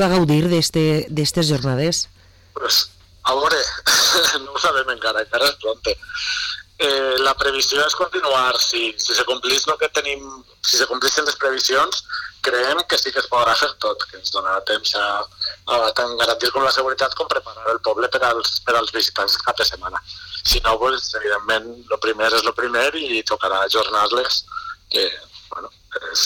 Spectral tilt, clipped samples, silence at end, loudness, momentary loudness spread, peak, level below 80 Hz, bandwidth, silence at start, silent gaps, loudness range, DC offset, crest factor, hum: -2.5 dB/octave; under 0.1%; 0 s; -18 LUFS; 8 LU; -8 dBFS; -42 dBFS; 19 kHz; 0 s; none; 2 LU; under 0.1%; 12 dB; none